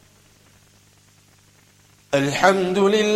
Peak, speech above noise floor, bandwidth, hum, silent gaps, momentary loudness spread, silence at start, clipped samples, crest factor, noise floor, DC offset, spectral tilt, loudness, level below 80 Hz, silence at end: 0 dBFS; 37 dB; 14.5 kHz; 50 Hz at -55 dBFS; none; 5 LU; 2.1 s; under 0.1%; 22 dB; -55 dBFS; under 0.1%; -4.5 dB/octave; -19 LUFS; -58 dBFS; 0 s